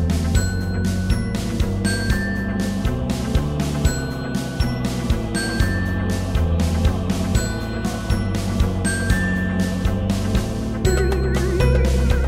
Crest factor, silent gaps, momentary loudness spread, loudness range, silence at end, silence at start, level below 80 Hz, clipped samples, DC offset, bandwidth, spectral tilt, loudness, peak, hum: 16 dB; none; 4 LU; 2 LU; 0 s; 0 s; -24 dBFS; under 0.1%; under 0.1%; 16 kHz; -6 dB/octave; -21 LUFS; -4 dBFS; none